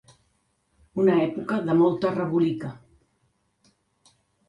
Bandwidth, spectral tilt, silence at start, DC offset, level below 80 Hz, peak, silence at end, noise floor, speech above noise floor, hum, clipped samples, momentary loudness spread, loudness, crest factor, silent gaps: 9.8 kHz; -8.5 dB/octave; 0.95 s; under 0.1%; -64 dBFS; -10 dBFS; 1.7 s; -70 dBFS; 47 dB; none; under 0.1%; 13 LU; -24 LUFS; 16 dB; none